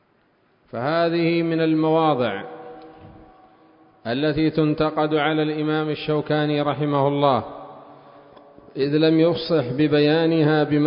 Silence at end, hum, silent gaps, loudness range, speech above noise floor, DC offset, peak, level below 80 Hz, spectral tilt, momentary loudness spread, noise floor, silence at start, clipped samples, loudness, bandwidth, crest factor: 0 s; none; none; 3 LU; 42 dB; under 0.1%; -4 dBFS; -56 dBFS; -11.5 dB/octave; 16 LU; -62 dBFS; 0.75 s; under 0.1%; -20 LUFS; 5.4 kHz; 18 dB